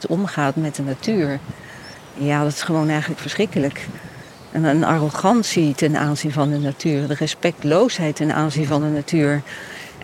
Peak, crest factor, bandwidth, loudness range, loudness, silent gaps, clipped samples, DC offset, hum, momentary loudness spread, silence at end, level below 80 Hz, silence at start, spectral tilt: -2 dBFS; 18 dB; 15 kHz; 3 LU; -20 LUFS; none; under 0.1%; under 0.1%; none; 16 LU; 0 s; -58 dBFS; 0 s; -6 dB/octave